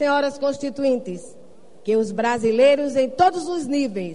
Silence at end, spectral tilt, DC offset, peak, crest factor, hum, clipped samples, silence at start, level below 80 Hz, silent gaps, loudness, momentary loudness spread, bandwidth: 0 s; -5 dB/octave; 0.7%; -4 dBFS; 16 dB; none; under 0.1%; 0 s; -58 dBFS; none; -21 LUFS; 10 LU; 10.5 kHz